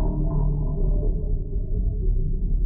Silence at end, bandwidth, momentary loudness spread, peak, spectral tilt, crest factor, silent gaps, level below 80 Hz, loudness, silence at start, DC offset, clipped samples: 0 s; 1.2 kHz; 4 LU; -12 dBFS; -14.5 dB/octave; 10 dB; none; -22 dBFS; -27 LUFS; 0 s; under 0.1%; under 0.1%